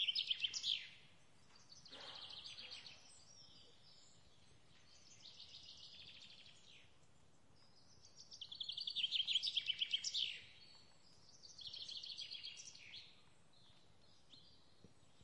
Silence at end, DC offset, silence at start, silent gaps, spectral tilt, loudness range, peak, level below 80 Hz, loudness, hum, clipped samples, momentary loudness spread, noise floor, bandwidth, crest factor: 0.35 s; under 0.1%; 0 s; none; 1 dB/octave; 18 LU; -28 dBFS; -84 dBFS; -43 LUFS; none; under 0.1%; 25 LU; -72 dBFS; 11 kHz; 22 dB